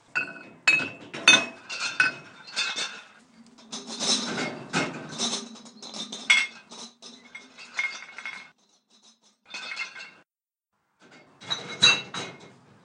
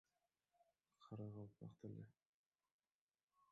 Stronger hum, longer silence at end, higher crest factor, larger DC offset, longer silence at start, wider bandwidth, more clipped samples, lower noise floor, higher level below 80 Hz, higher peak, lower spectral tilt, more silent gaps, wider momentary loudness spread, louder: neither; first, 0.35 s vs 0.05 s; first, 28 dB vs 18 dB; neither; second, 0.15 s vs 0.6 s; first, 11 kHz vs 7.2 kHz; neither; about the same, under -90 dBFS vs under -90 dBFS; first, -80 dBFS vs -86 dBFS; first, 0 dBFS vs -42 dBFS; second, -0.5 dB/octave vs -9.5 dB/octave; second, none vs 2.26-2.51 s, 2.72-2.79 s, 2.92-3.09 s, 3.23-3.28 s; first, 24 LU vs 6 LU; first, -25 LUFS vs -58 LUFS